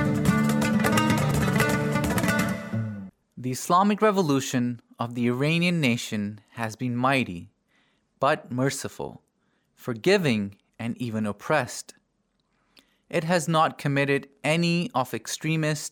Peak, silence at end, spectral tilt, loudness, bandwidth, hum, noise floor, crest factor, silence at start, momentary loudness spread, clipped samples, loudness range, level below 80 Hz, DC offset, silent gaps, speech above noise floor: -8 dBFS; 0 s; -5.5 dB/octave; -25 LUFS; 19.5 kHz; none; -72 dBFS; 18 dB; 0 s; 13 LU; under 0.1%; 4 LU; -52 dBFS; under 0.1%; none; 47 dB